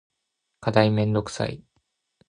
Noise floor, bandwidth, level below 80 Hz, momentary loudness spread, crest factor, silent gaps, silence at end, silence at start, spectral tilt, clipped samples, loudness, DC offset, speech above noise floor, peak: -79 dBFS; 10.5 kHz; -54 dBFS; 11 LU; 24 dB; none; 0.7 s; 0.6 s; -6.5 dB/octave; under 0.1%; -24 LUFS; under 0.1%; 57 dB; -2 dBFS